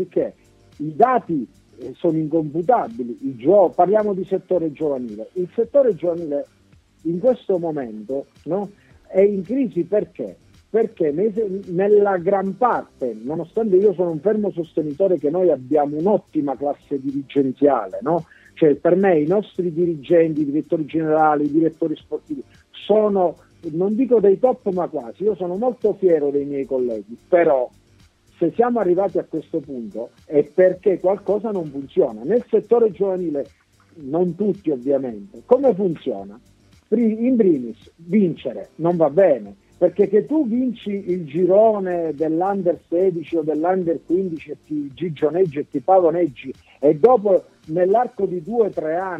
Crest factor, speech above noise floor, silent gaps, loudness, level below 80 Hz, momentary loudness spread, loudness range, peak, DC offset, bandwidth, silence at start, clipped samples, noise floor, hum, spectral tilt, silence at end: 18 dB; 35 dB; none; -20 LUFS; -60 dBFS; 12 LU; 3 LU; -2 dBFS; under 0.1%; 6 kHz; 0 s; under 0.1%; -54 dBFS; none; -9.5 dB/octave; 0 s